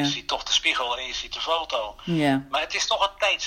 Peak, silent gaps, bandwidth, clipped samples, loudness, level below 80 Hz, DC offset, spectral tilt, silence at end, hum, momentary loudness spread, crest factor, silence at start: -8 dBFS; none; 16 kHz; under 0.1%; -24 LUFS; -52 dBFS; under 0.1%; -3 dB/octave; 0 s; none; 8 LU; 18 dB; 0 s